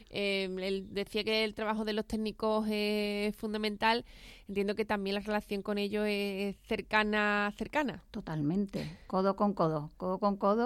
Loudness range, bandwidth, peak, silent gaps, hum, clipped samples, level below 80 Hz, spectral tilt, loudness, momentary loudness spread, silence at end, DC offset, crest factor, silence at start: 1 LU; 14.5 kHz; -14 dBFS; none; none; under 0.1%; -58 dBFS; -6 dB/octave; -33 LUFS; 7 LU; 0 s; under 0.1%; 20 dB; 0 s